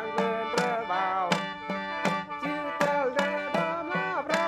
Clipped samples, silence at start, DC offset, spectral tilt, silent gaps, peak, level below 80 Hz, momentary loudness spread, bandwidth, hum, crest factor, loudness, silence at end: under 0.1%; 0 s; under 0.1%; -4.5 dB/octave; none; -10 dBFS; -68 dBFS; 5 LU; 15.5 kHz; none; 18 dB; -29 LUFS; 0 s